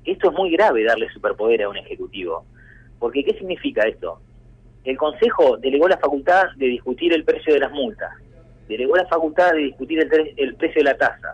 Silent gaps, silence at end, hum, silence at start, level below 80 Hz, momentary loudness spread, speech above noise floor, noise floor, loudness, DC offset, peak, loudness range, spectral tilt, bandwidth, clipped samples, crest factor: none; 0 s; 50 Hz at -60 dBFS; 0.05 s; -50 dBFS; 13 LU; 28 dB; -47 dBFS; -19 LUFS; under 0.1%; -6 dBFS; 6 LU; -5.5 dB/octave; 8 kHz; under 0.1%; 14 dB